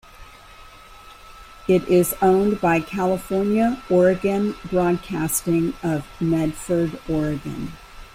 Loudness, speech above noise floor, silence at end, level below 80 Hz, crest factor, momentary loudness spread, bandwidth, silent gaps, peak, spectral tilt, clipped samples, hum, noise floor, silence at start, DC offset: -21 LUFS; 24 dB; 0.1 s; -44 dBFS; 16 dB; 8 LU; 16 kHz; none; -6 dBFS; -6 dB/octave; under 0.1%; none; -44 dBFS; 0.2 s; under 0.1%